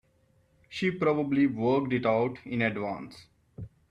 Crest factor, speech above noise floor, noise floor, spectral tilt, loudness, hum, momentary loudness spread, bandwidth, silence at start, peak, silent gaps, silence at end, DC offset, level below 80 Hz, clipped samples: 18 dB; 39 dB; -67 dBFS; -7.5 dB/octave; -28 LUFS; none; 21 LU; 9 kHz; 0.7 s; -12 dBFS; none; 0.25 s; under 0.1%; -64 dBFS; under 0.1%